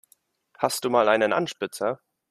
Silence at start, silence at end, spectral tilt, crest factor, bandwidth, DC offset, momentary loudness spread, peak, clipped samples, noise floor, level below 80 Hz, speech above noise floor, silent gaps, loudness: 0.6 s; 0.35 s; -3.5 dB/octave; 20 dB; 15 kHz; under 0.1%; 10 LU; -6 dBFS; under 0.1%; -64 dBFS; -70 dBFS; 41 dB; none; -24 LUFS